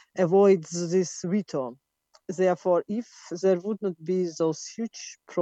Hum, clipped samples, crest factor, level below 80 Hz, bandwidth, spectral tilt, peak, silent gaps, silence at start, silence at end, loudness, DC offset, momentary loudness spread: none; under 0.1%; 16 dB; -76 dBFS; 8.4 kHz; -6 dB/octave; -10 dBFS; none; 0.15 s; 0 s; -26 LUFS; under 0.1%; 15 LU